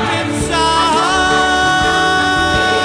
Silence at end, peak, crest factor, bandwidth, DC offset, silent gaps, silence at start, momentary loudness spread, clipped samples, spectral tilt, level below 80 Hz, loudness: 0 s; -2 dBFS; 12 dB; 10.5 kHz; under 0.1%; none; 0 s; 4 LU; under 0.1%; -3 dB/octave; -32 dBFS; -13 LUFS